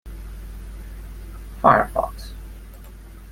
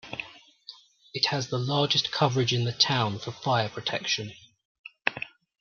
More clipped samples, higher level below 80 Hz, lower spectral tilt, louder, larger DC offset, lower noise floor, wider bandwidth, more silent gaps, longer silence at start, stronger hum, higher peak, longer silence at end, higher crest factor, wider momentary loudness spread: neither; first, -36 dBFS vs -68 dBFS; first, -6.5 dB/octave vs -4 dB/octave; first, -19 LUFS vs -26 LUFS; neither; second, -40 dBFS vs -51 dBFS; first, 16.5 kHz vs 7.2 kHz; second, none vs 4.65-4.84 s; about the same, 0.05 s vs 0.05 s; first, 50 Hz at -35 dBFS vs none; about the same, -2 dBFS vs -4 dBFS; second, 0 s vs 0.35 s; about the same, 24 dB vs 26 dB; first, 26 LU vs 19 LU